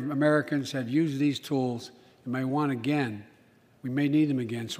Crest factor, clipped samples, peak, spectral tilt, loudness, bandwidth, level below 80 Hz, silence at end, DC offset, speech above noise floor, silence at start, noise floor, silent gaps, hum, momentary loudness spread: 18 dB; under 0.1%; -10 dBFS; -6.5 dB/octave; -28 LUFS; 15.5 kHz; -74 dBFS; 0 s; under 0.1%; 33 dB; 0 s; -60 dBFS; none; none; 14 LU